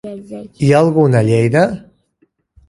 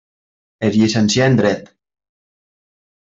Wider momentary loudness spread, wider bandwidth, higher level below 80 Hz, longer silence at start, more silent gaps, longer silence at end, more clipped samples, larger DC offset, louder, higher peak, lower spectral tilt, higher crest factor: first, 19 LU vs 8 LU; first, 11.5 kHz vs 8 kHz; about the same, -50 dBFS vs -54 dBFS; second, 0.05 s vs 0.6 s; neither; second, 0.9 s vs 1.35 s; neither; neither; first, -13 LUFS vs -16 LUFS; about the same, 0 dBFS vs -2 dBFS; first, -7.5 dB/octave vs -5.5 dB/octave; about the same, 14 dB vs 16 dB